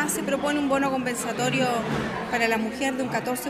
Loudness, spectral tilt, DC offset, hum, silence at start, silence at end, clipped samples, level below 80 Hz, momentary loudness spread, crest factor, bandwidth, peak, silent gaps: -25 LUFS; -4 dB/octave; under 0.1%; none; 0 s; 0 s; under 0.1%; -54 dBFS; 4 LU; 16 dB; 16 kHz; -8 dBFS; none